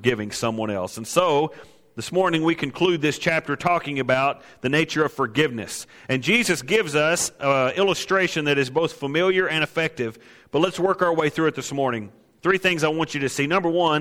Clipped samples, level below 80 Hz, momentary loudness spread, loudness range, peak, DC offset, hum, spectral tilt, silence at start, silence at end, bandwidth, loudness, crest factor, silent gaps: under 0.1%; -58 dBFS; 8 LU; 2 LU; -4 dBFS; under 0.1%; none; -4 dB/octave; 0 s; 0 s; 16.5 kHz; -22 LUFS; 18 dB; none